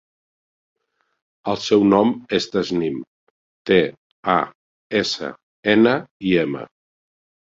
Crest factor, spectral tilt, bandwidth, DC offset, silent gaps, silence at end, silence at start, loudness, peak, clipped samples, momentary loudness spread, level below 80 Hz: 20 dB; -5.5 dB/octave; 7.8 kHz; under 0.1%; 3.07-3.65 s, 3.97-4.23 s, 4.55-4.90 s, 5.43-5.63 s, 6.11-6.20 s; 0.9 s; 1.45 s; -20 LUFS; -2 dBFS; under 0.1%; 15 LU; -58 dBFS